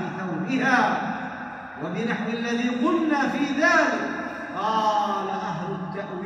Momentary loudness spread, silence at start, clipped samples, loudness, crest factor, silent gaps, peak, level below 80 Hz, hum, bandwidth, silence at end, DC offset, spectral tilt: 12 LU; 0 s; under 0.1%; -24 LUFS; 18 dB; none; -6 dBFS; -64 dBFS; none; 10 kHz; 0 s; under 0.1%; -5 dB/octave